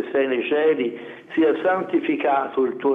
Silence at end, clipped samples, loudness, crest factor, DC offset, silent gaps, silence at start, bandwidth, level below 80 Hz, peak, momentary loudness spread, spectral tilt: 0 s; under 0.1%; -21 LUFS; 12 dB; under 0.1%; none; 0 s; 3.9 kHz; -74 dBFS; -8 dBFS; 7 LU; -7.5 dB/octave